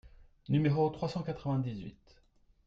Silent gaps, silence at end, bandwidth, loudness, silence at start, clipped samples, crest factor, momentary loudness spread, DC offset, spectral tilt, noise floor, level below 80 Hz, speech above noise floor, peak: none; 0.75 s; 7.4 kHz; -33 LUFS; 0.05 s; under 0.1%; 18 dB; 13 LU; under 0.1%; -9 dB/octave; -66 dBFS; -60 dBFS; 34 dB; -16 dBFS